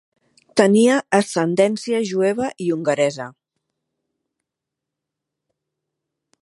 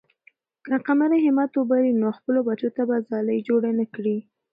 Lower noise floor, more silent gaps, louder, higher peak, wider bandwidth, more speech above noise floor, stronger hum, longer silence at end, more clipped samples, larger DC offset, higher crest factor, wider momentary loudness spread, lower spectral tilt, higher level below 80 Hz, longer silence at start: first, -84 dBFS vs -60 dBFS; neither; first, -19 LUFS vs -23 LUFS; first, 0 dBFS vs -8 dBFS; first, 11.5 kHz vs 4.9 kHz; first, 66 dB vs 38 dB; neither; first, 3.15 s vs 0.3 s; neither; neither; first, 20 dB vs 14 dB; about the same, 8 LU vs 7 LU; second, -5 dB/octave vs -10.5 dB/octave; first, -68 dBFS vs -74 dBFS; about the same, 0.55 s vs 0.65 s